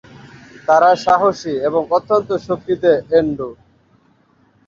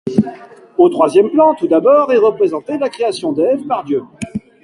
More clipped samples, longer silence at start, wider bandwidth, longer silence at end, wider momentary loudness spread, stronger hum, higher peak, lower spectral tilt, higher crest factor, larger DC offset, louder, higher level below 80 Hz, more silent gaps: neither; first, 0.7 s vs 0.05 s; second, 7.4 kHz vs 11.5 kHz; first, 1.15 s vs 0.25 s; second, 10 LU vs 13 LU; neither; about the same, -2 dBFS vs 0 dBFS; about the same, -6 dB/octave vs -6.5 dB/octave; about the same, 16 dB vs 14 dB; neither; about the same, -16 LUFS vs -14 LUFS; about the same, -54 dBFS vs -56 dBFS; neither